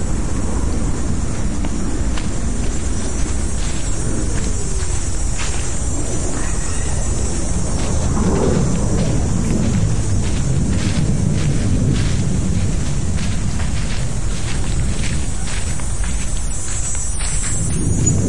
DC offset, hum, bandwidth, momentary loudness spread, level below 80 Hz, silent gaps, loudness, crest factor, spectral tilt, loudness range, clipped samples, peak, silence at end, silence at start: 10%; none; 11.5 kHz; 5 LU; -22 dBFS; none; -21 LUFS; 18 dB; -5 dB/octave; 4 LU; under 0.1%; -2 dBFS; 0 s; 0 s